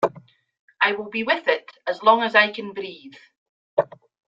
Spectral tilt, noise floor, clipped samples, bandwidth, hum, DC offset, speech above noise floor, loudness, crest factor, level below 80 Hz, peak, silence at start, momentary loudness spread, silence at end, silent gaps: -5 dB/octave; -49 dBFS; under 0.1%; 7.6 kHz; none; under 0.1%; 27 dB; -21 LUFS; 22 dB; -72 dBFS; -2 dBFS; 0 s; 16 LU; 0.45 s; 0.59-0.68 s, 3.37-3.77 s